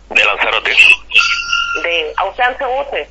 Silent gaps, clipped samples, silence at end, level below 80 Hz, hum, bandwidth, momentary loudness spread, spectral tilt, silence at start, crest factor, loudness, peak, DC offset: none; 0.3%; 0.05 s; -42 dBFS; none; 11 kHz; 12 LU; 0 dB/octave; 0.1 s; 14 dB; -11 LUFS; 0 dBFS; under 0.1%